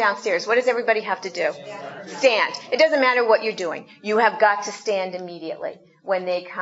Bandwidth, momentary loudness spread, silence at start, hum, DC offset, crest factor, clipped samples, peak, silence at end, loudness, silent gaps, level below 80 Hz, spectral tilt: 8 kHz; 15 LU; 0 s; none; under 0.1%; 20 dB; under 0.1%; -2 dBFS; 0 s; -21 LUFS; none; -80 dBFS; -3 dB/octave